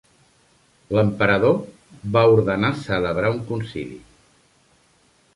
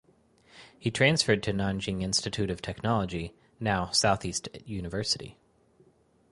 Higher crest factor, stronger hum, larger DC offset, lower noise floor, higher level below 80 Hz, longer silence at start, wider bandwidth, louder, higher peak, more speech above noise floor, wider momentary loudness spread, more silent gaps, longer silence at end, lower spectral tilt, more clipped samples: about the same, 18 dB vs 22 dB; neither; neither; second, -59 dBFS vs -64 dBFS; about the same, -50 dBFS vs -50 dBFS; first, 0.9 s vs 0.55 s; about the same, 11.5 kHz vs 11.5 kHz; first, -20 LUFS vs -28 LUFS; first, -4 dBFS vs -8 dBFS; first, 40 dB vs 35 dB; first, 16 LU vs 12 LU; neither; first, 1.35 s vs 1 s; first, -7.5 dB/octave vs -4 dB/octave; neither